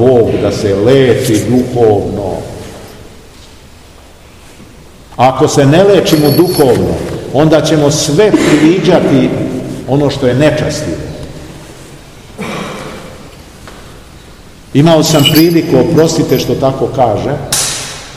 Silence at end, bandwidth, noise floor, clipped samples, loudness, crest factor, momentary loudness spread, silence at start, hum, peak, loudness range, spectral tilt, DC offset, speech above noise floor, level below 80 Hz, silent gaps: 0 s; 18 kHz; -36 dBFS; 2%; -10 LUFS; 10 dB; 18 LU; 0 s; none; 0 dBFS; 13 LU; -5.5 dB/octave; 0.5%; 28 dB; -36 dBFS; none